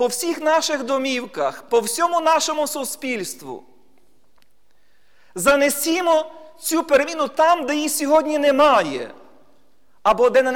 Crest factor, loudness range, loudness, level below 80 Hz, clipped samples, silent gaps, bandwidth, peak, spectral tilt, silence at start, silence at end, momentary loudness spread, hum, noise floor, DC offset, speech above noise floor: 16 dB; 6 LU; -19 LUFS; -56 dBFS; under 0.1%; none; 19 kHz; -4 dBFS; -2 dB/octave; 0 s; 0 s; 13 LU; none; -65 dBFS; 0.4%; 46 dB